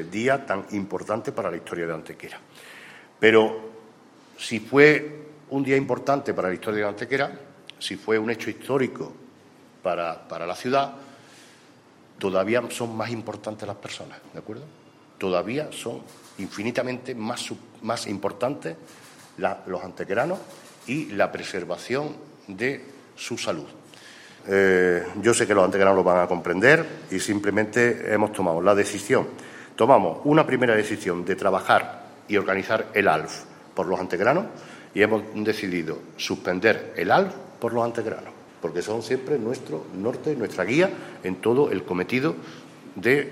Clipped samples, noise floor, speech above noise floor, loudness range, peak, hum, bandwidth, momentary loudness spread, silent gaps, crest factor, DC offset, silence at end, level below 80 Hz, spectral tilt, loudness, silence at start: under 0.1%; -53 dBFS; 29 dB; 9 LU; -2 dBFS; none; 15.5 kHz; 19 LU; none; 24 dB; under 0.1%; 0 s; -68 dBFS; -5 dB/octave; -24 LUFS; 0 s